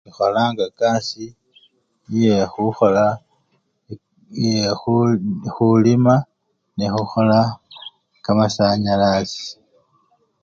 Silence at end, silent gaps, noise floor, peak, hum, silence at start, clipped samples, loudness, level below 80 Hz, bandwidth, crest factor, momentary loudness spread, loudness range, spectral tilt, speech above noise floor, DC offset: 0.9 s; none; -66 dBFS; -2 dBFS; none; 0.2 s; under 0.1%; -18 LUFS; -52 dBFS; 7.4 kHz; 18 dB; 21 LU; 3 LU; -6.5 dB/octave; 49 dB; under 0.1%